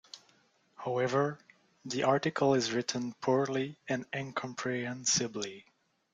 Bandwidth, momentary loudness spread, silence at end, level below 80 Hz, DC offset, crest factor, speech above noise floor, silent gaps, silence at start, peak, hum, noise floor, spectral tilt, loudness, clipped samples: 9.6 kHz; 14 LU; 0.5 s; -74 dBFS; under 0.1%; 22 dB; 36 dB; none; 0.15 s; -12 dBFS; none; -68 dBFS; -4 dB/octave; -32 LUFS; under 0.1%